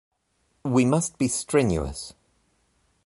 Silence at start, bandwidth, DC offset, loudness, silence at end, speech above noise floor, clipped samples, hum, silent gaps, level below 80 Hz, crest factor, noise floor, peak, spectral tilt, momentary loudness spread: 0.65 s; 11.5 kHz; under 0.1%; -24 LUFS; 0.95 s; 47 dB; under 0.1%; none; none; -44 dBFS; 18 dB; -70 dBFS; -8 dBFS; -5.5 dB/octave; 15 LU